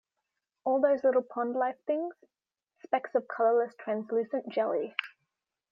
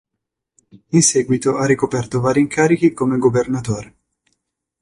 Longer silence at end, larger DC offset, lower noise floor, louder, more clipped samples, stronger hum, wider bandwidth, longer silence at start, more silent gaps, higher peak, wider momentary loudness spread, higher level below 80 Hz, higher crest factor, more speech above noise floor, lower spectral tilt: second, 0.65 s vs 1 s; neither; first, -85 dBFS vs -80 dBFS; second, -30 LUFS vs -17 LUFS; neither; neither; second, 5.8 kHz vs 11.5 kHz; second, 0.65 s vs 0.95 s; neither; second, -12 dBFS vs -2 dBFS; about the same, 9 LU vs 7 LU; second, -86 dBFS vs -52 dBFS; about the same, 18 dB vs 16 dB; second, 56 dB vs 63 dB; first, -7 dB/octave vs -5 dB/octave